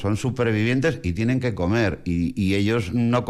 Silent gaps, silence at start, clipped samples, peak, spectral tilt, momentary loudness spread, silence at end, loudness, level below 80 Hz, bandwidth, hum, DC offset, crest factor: none; 0 s; under 0.1%; -10 dBFS; -7 dB/octave; 4 LU; 0 s; -22 LUFS; -46 dBFS; 12.5 kHz; none; under 0.1%; 10 dB